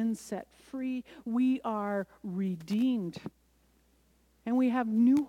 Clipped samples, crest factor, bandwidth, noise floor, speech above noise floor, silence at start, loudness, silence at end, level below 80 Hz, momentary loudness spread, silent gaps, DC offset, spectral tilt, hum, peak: under 0.1%; 14 dB; 12.5 kHz; -67 dBFS; 37 dB; 0 s; -32 LUFS; 0 s; -70 dBFS; 13 LU; none; under 0.1%; -7 dB/octave; none; -18 dBFS